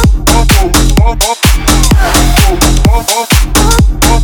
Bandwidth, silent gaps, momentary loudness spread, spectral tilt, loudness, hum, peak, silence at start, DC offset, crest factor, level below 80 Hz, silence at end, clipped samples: over 20 kHz; none; 2 LU; -4 dB/octave; -8 LUFS; none; 0 dBFS; 0 s; under 0.1%; 6 dB; -10 dBFS; 0 s; 0.5%